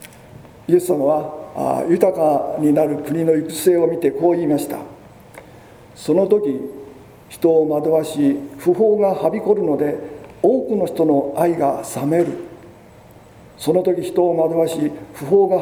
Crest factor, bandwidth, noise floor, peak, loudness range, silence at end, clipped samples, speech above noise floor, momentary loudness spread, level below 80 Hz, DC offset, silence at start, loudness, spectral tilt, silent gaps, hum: 18 dB; over 20 kHz; -44 dBFS; 0 dBFS; 3 LU; 0 s; under 0.1%; 27 dB; 12 LU; -56 dBFS; under 0.1%; 0 s; -18 LUFS; -6.5 dB/octave; none; none